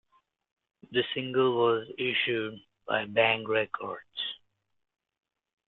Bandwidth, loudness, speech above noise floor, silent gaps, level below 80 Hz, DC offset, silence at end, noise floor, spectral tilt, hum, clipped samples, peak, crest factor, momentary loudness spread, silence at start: 4.3 kHz; -29 LUFS; 38 dB; none; -72 dBFS; under 0.1%; 1.3 s; -67 dBFS; -8 dB/octave; none; under 0.1%; -8 dBFS; 22 dB; 12 LU; 0.9 s